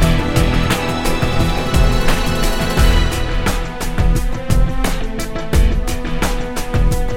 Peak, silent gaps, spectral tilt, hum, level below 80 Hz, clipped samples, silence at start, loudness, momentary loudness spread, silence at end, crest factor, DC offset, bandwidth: 0 dBFS; none; -5 dB/octave; none; -18 dBFS; under 0.1%; 0 s; -18 LUFS; 7 LU; 0 s; 14 dB; under 0.1%; 16.5 kHz